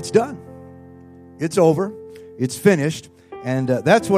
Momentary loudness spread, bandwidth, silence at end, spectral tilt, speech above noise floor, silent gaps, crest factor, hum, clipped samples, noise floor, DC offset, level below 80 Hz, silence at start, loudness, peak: 23 LU; 15.5 kHz; 0 s; -6 dB/octave; 25 dB; none; 20 dB; none; under 0.1%; -43 dBFS; under 0.1%; -62 dBFS; 0 s; -20 LUFS; 0 dBFS